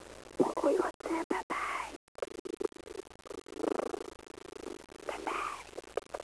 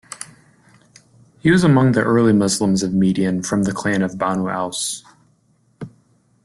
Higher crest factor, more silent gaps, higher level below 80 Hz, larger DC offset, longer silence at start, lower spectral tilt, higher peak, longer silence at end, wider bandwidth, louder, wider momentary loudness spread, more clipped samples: first, 24 dB vs 16 dB; first, 0.94-1.00 s, 1.24-1.30 s, 1.43-1.50 s, 1.96-2.15 s, 2.39-2.45 s vs none; second, -66 dBFS vs -52 dBFS; neither; about the same, 0 s vs 0.1 s; second, -4 dB/octave vs -5.5 dB/octave; second, -14 dBFS vs -4 dBFS; second, 0 s vs 0.55 s; second, 11 kHz vs 12.5 kHz; second, -37 LUFS vs -17 LUFS; second, 16 LU vs 21 LU; neither